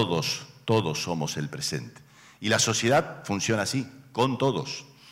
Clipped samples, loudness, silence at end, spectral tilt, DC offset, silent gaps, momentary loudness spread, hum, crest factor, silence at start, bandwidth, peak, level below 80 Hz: under 0.1%; -27 LUFS; 0 s; -4 dB/octave; under 0.1%; none; 12 LU; none; 14 dB; 0 s; 16 kHz; -14 dBFS; -64 dBFS